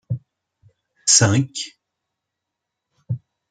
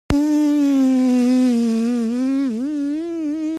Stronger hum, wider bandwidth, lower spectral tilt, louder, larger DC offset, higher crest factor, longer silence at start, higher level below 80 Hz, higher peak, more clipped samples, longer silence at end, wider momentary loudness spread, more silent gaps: neither; second, 10 kHz vs 13 kHz; second, -3 dB/octave vs -6 dB/octave; about the same, -17 LUFS vs -18 LUFS; neither; first, 24 dB vs 14 dB; about the same, 0.1 s vs 0.1 s; second, -60 dBFS vs -42 dBFS; first, 0 dBFS vs -4 dBFS; neither; first, 0.35 s vs 0 s; first, 18 LU vs 8 LU; neither